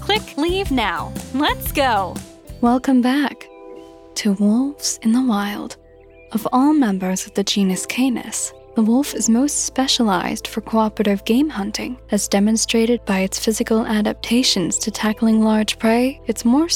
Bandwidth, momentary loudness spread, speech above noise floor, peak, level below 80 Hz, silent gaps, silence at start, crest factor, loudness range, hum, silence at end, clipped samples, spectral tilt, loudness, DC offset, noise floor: 17.5 kHz; 9 LU; 27 dB; -4 dBFS; -42 dBFS; none; 0 s; 14 dB; 2 LU; none; 0 s; under 0.1%; -4 dB/octave; -19 LUFS; under 0.1%; -45 dBFS